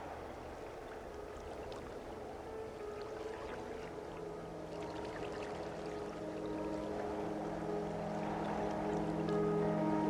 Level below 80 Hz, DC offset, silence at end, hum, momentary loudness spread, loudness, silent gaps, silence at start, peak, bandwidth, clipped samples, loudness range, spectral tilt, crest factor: -58 dBFS; under 0.1%; 0 s; none; 12 LU; -42 LUFS; none; 0 s; -24 dBFS; 14 kHz; under 0.1%; 8 LU; -7 dB/octave; 16 dB